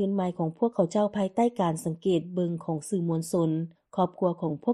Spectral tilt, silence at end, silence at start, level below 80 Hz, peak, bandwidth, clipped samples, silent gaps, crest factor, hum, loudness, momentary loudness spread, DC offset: -7.5 dB/octave; 0 s; 0 s; -68 dBFS; -10 dBFS; 13 kHz; under 0.1%; none; 16 dB; none; -28 LUFS; 5 LU; under 0.1%